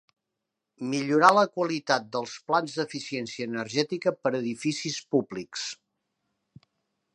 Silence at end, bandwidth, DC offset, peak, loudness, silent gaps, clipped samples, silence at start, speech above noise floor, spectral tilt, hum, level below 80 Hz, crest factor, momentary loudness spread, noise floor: 1.4 s; 11.5 kHz; under 0.1%; -4 dBFS; -27 LUFS; none; under 0.1%; 0.8 s; 58 dB; -4 dB/octave; none; -76 dBFS; 24 dB; 14 LU; -85 dBFS